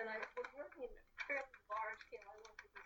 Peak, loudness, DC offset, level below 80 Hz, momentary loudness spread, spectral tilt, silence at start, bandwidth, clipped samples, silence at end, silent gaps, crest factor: -30 dBFS; -48 LUFS; under 0.1%; -72 dBFS; 13 LU; -3 dB/octave; 0 s; 19 kHz; under 0.1%; 0 s; none; 18 dB